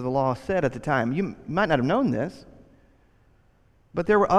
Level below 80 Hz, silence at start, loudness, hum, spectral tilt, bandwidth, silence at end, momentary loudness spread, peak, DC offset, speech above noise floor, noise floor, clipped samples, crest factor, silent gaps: -52 dBFS; 0 s; -25 LUFS; none; -7.5 dB/octave; 11.5 kHz; 0 s; 8 LU; -6 dBFS; under 0.1%; 37 dB; -61 dBFS; under 0.1%; 20 dB; none